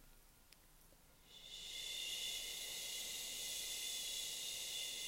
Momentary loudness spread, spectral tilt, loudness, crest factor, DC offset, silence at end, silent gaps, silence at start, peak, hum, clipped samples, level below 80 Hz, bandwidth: 8 LU; 1.5 dB/octave; -43 LUFS; 16 dB; under 0.1%; 0 s; none; 0 s; -32 dBFS; none; under 0.1%; -70 dBFS; 16 kHz